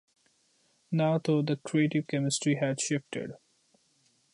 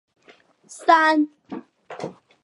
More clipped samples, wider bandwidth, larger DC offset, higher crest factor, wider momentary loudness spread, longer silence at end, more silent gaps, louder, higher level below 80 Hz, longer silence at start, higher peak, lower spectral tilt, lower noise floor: neither; about the same, 11.5 kHz vs 11.5 kHz; neither; second, 16 dB vs 22 dB; second, 8 LU vs 22 LU; first, 0.95 s vs 0.35 s; neither; second, -29 LUFS vs -19 LUFS; about the same, -76 dBFS vs -78 dBFS; first, 0.9 s vs 0.7 s; second, -14 dBFS vs -2 dBFS; first, -5.5 dB/octave vs -4 dB/octave; first, -69 dBFS vs -55 dBFS